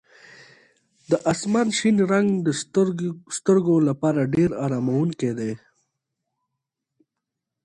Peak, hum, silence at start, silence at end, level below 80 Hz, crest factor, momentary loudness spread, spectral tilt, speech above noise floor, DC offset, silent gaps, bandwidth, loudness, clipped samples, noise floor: -6 dBFS; none; 1.1 s; 2.05 s; -60 dBFS; 16 dB; 8 LU; -6 dB/octave; 62 dB; under 0.1%; none; 11 kHz; -22 LUFS; under 0.1%; -83 dBFS